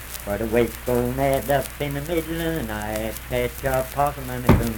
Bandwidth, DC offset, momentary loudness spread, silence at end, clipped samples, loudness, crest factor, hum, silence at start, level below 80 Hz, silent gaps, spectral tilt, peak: 19 kHz; under 0.1%; 7 LU; 0 s; under 0.1%; -24 LUFS; 22 dB; none; 0 s; -34 dBFS; none; -5.5 dB/octave; 0 dBFS